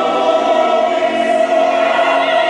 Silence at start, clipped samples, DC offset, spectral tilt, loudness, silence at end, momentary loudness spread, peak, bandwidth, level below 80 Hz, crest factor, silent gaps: 0 s; under 0.1%; under 0.1%; -3 dB/octave; -13 LUFS; 0 s; 2 LU; -2 dBFS; 10 kHz; -62 dBFS; 12 dB; none